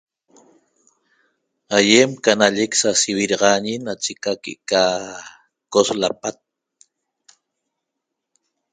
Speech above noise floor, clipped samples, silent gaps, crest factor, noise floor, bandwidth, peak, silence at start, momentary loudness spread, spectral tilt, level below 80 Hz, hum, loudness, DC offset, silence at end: 62 dB; under 0.1%; none; 22 dB; -80 dBFS; 9.6 kHz; 0 dBFS; 1.7 s; 14 LU; -2.5 dB/octave; -62 dBFS; none; -18 LUFS; under 0.1%; 2.4 s